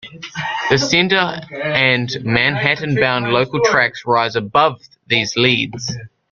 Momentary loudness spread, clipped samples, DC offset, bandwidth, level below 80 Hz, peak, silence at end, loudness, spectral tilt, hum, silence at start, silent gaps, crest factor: 9 LU; under 0.1%; under 0.1%; 7.4 kHz; -52 dBFS; 0 dBFS; 0.25 s; -16 LUFS; -4 dB/octave; none; 0.05 s; none; 18 dB